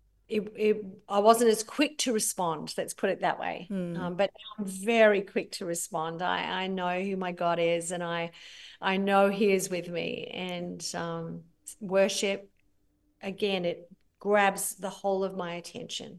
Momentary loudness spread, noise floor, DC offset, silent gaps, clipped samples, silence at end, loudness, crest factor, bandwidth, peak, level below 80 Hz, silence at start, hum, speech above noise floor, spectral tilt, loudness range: 14 LU; -70 dBFS; under 0.1%; none; under 0.1%; 0 s; -29 LUFS; 24 dB; 13 kHz; -6 dBFS; -72 dBFS; 0.3 s; none; 41 dB; -4 dB/octave; 5 LU